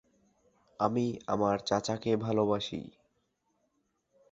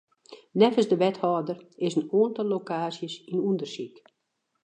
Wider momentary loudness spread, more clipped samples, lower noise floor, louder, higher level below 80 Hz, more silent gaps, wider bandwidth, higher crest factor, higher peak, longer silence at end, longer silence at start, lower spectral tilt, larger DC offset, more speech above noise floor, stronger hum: second, 8 LU vs 14 LU; neither; about the same, -77 dBFS vs -78 dBFS; second, -31 LUFS vs -26 LUFS; first, -64 dBFS vs -80 dBFS; neither; second, 8.2 kHz vs 9.4 kHz; about the same, 22 dB vs 20 dB; second, -12 dBFS vs -6 dBFS; first, 1.45 s vs 0.75 s; first, 0.8 s vs 0.3 s; about the same, -6 dB/octave vs -6.5 dB/octave; neither; second, 47 dB vs 52 dB; neither